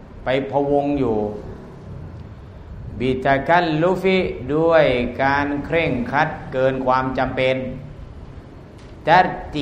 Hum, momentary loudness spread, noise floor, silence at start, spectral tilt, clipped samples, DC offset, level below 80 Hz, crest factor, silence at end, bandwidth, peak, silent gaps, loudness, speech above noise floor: none; 22 LU; -39 dBFS; 0 s; -7.5 dB/octave; under 0.1%; under 0.1%; -40 dBFS; 20 dB; 0 s; 9.8 kHz; 0 dBFS; none; -19 LUFS; 21 dB